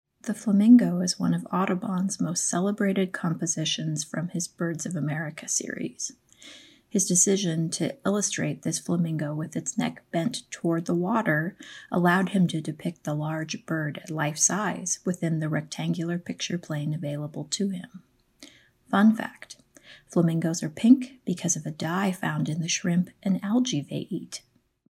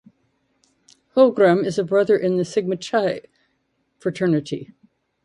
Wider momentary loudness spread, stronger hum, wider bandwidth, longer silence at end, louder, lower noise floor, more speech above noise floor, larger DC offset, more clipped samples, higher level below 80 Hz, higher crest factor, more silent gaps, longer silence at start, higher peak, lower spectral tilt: about the same, 11 LU vs 13 LU; neither; first, 15 kHz vs 11 kHz; about the same, 0.55 s vs 0.6 s; second, -26 LUFS vs -20 LUFS; second, -53 dBFS vs -70 dBFS; second, 27 dB vs 51 dB; neither; neither; second, -72 dBFS vs -66 dBFS; about the same, 20 dB vs 18 dB; neither; second, 0.25 s vs 1.15 s; about the same, -6 dBFS vs -4 dBFS; second, -4.5 dB/octave vs -6.5 dB/octave